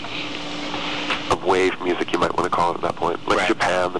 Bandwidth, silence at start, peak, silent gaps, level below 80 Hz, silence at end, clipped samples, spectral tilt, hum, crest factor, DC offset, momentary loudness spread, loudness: 11 kHz; 0 s; -6 dBFS; none; -48 dBFS; 0 s; under 0.1%; -4 dB/octave; none; 16 dB; 2%; 8 LU; -22 LUFS